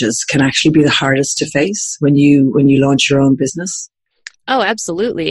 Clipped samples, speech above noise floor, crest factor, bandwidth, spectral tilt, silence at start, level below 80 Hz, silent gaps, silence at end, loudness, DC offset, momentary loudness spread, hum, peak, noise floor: under 0.1%; 26 dB; 12 dB; 12 kHz; -4.5 dB/octave; 0 s; -48 dBFS; none; 0 s; -13 LUFS; under 0.1%; 9 LU; none; 0 dBFS; -39 dBFS